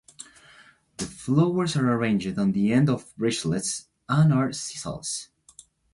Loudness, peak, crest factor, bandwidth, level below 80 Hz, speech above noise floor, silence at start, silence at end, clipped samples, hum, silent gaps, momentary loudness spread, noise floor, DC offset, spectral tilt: -25 LUFS; -8 dBFS; 18 dB; 11.5 kHz; -58 dBFS; 31 dB; 0.2 s; 0.7 s; under 0.1%; none; none; 15 LU; -55 dBFS; under 0.1%; -5.5 dB/octave